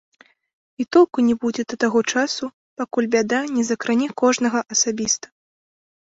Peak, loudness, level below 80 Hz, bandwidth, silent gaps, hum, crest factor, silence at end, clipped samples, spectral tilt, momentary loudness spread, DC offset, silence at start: -4 dBFS; -20 LUFS; -64 dBFS; 8 kHz; 2.53-2.77 s; none; 18 dB; 0.95 s; under 0.1%; -2.5 dB/octave; 8 LU; under 0.1%; 0.8 s